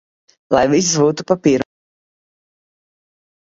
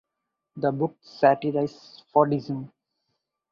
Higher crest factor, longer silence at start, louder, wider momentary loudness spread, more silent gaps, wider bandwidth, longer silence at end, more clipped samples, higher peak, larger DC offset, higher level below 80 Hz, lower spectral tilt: about the same, 18 dB vs 22 dB; about the same, 0.5 s vs 0.55 s; first, -16 LUFS vs -25 LUFS; second, 6 LU vs 13 LU; neither; about the same, 7.8 kHz vs 7.2 kHz; first, 1.8 s vs 0.85 s; neither; first, 0 dBFS vs -4 dBFS; neither; first, -52 dBFS vs -68 dBFS; second, -4.5 dB/octave vs -8.5 dB/octave